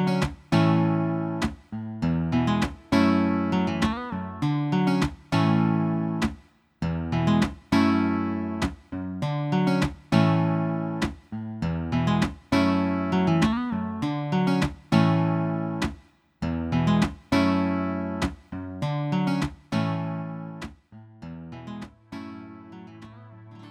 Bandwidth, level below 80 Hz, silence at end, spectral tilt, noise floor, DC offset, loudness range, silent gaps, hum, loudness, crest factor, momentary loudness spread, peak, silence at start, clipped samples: 12.5 kHz; -44 dBFS; 0 s; -7 dB/octave; -49 dBFS; under 0.1%; 6 LU; none; none; -25 LUFS; 20 dB; 17 LU; -6 dBFS; 0 s; under 0.1%